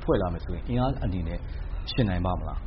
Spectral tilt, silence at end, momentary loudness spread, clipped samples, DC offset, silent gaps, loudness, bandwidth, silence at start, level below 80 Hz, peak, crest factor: -6.5 dB/octave; 0 s; 9 LU; under 0.1%; under 0.1%; none; -29 LUFS; 5.8 kHz; 0 s; -34 dBFS; -10 dBFS; 18 dB